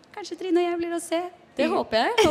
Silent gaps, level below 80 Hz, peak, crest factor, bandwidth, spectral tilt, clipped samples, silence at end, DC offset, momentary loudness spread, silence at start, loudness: none; -56 dBFS; -6 dBFS; 18 dB; 15.5 kHz; -3.5 dB/octave; under 0.1%; 0 s; under 0.1%; 11 LU; 0.15 s; -25 LUFS